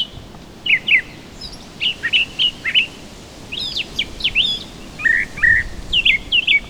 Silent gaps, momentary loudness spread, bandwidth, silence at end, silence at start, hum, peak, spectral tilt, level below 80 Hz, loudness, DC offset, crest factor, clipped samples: none; 20 LU; over 20 kHz; 0 s; 0 s; none; -2 dBFS; -1.5 dB/octave; -38 dBFS; -16 LUFS; under 0.1%; 18 dB; under 0.1%